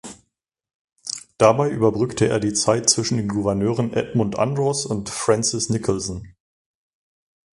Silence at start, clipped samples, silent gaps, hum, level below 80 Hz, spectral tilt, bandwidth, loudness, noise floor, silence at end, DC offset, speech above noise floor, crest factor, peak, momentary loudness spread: 0.05 s; under 0.1%; 0.75-0.88 s; none; -50 dBFS; -4.5 dB/octave; 11.5 kHz; -21 LUFS; -74 dBFS; 1.25 s; under 0.1%; 54 dB; 22 dB; 0 dBFS; 13 LU